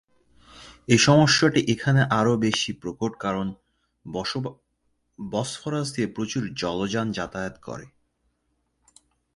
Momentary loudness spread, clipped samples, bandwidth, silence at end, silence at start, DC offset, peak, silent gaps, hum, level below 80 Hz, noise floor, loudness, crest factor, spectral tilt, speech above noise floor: 17 LU; under 0.1%; 11.5 kHz; 1.5 s; 0.55 s; under 0.1%; -4 dBFS; none; none; -56 dBFS; -73 dBFS; -23 LUFS; 22 dB; -4.5 dB/octave; 50 dB